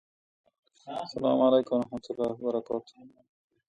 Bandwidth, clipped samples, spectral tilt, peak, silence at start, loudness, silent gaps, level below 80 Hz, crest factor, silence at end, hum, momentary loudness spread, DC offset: 9 kHz; under 0.1%; -7 dB/octave; -12 dBFS; 0.85 s; -29 LUFS; none; -68 dBFS; 18 dB; 0.7 s; none; 14 LU; under 0.1%